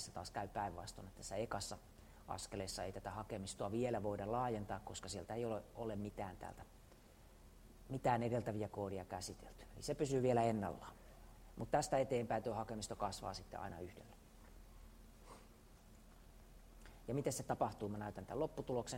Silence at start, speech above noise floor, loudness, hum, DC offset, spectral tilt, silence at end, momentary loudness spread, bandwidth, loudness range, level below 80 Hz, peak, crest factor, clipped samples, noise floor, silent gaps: 0 s; 20 dB; -43 LUFS; none; under 0.1%; -5.5 dB/octave; 0 s; 25 LU; 16 kHz; 10 LU; -62 dBFS; -22 dBFS; 22 dB; under 0.1%; -63 dBFS; none